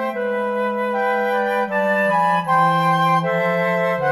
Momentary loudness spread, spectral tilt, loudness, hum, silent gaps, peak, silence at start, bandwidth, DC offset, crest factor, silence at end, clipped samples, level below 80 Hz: 5 LU; -6.5 dB/octave; -18 LUFS; none; none; -6 dBFS; 0 s; 15 kHz; under 0.1%; 12 dB; 0 s; under 0.1%; -62 dBFS